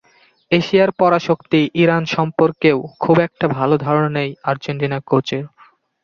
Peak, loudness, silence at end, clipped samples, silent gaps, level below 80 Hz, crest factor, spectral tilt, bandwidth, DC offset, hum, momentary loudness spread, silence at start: -2 dBFS; -17 LUFS; 0.55 s; under 0.1%; none; -56 dBFS; 16 dB; -7 dB/octave; 7 kHz; under 0.1%; none; 7 LU; 0.5 s